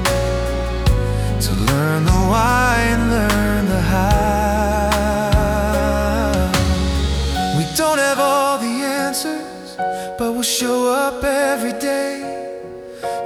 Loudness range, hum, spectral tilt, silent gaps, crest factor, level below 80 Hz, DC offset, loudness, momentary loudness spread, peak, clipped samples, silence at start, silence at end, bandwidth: 3 LU; none; -5 dB/octave; none; 14 dB; -24 dBFS; under 0.1%; -18 LUFS; 9 LU; -4 dBFS; under 0.1%; 0 s; 0 s; 20 kHz